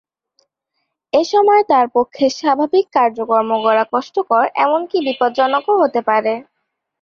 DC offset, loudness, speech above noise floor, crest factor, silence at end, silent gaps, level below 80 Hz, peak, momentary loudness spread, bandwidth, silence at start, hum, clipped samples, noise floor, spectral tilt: under 0.1%; -15 LUFS; 59 dB; 14 dB; 0.6 s; none; -64 dBFS; -2 dBFS; 6 LU; 7.2 kHz; 1.15 s; none; under 0.1%; -74 dBFS; -4 dB/octave